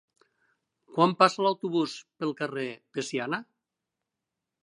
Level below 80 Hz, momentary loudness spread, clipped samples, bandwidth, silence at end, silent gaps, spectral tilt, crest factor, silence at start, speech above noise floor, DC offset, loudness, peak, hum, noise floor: -84 dBFS; 13 LU; under 0.1%; 11 kHz; 1.2 s; none; -5 dB/octave; 24 dB; 0.9 s; 59 dB; under 0.1%; -28 LUFS; -6 dBFS; none; -87 dBFS